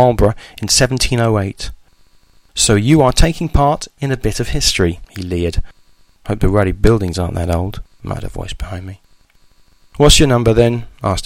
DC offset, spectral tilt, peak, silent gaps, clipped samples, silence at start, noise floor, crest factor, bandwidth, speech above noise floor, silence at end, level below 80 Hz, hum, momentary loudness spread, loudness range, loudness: under 0.1%; -4.5 dB/octave; 0 dBFS; none; under 0.1%; 0 s; -50 dBFS; 16 dB; 16.5 kHz; 36 dB; 0 s; -24 dBFS; none; 16 LU; 4 LU; -15 LUFS